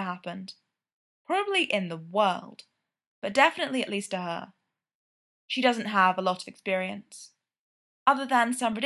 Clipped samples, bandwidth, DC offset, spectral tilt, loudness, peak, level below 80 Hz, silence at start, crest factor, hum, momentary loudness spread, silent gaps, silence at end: under 0.1%; 12.5 kHz; under 0.1%; -4 dB/octave; -27 LUFS; -6 dBFS; -78 dBFS; 0 s; 24 dB; none; 15 LU; 0.93-1.25 s, 3.07-3.22 s, 4.94-5.48 s, 7.59-8.06 s; 0 s